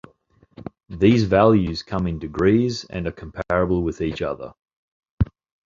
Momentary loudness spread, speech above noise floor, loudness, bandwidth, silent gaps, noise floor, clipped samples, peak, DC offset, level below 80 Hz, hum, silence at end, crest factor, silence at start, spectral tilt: 19 LU; 38 dB; -21 LUFS; 7.6 kHz; 4.76-5.00 s, 5.11-5.18 s; -58 dBFS; under 0.1%; -2 dBFS; under 0.1%; -38 dBFS; none; 0.4 s; 20 dB; 0.65 s; -7.5 dB/octave